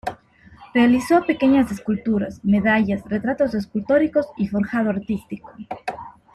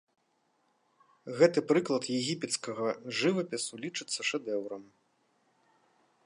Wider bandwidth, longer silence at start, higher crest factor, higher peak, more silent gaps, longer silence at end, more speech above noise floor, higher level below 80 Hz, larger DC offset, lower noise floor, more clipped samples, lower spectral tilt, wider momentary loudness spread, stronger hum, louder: first, 13.5 kHz vs 11.5 kHz; second, 0.05 s vs 1.25 s; second, 16 dB vs 22 dB; first, -4 dBFS vs -10 dBFS; neither; second, 0.25 s vs 1.4 s; second, 28 dB vs 43 dB; first, -50 dBFS vs -84 dBFS; neither; second, -48 dBFS vs -74 dBFS; neither; first, -7 dB/octave vs -4 dB/octave; about the same, 15 LU vs 13 LU; neither; first, -20 LUFS vs -31 LUFS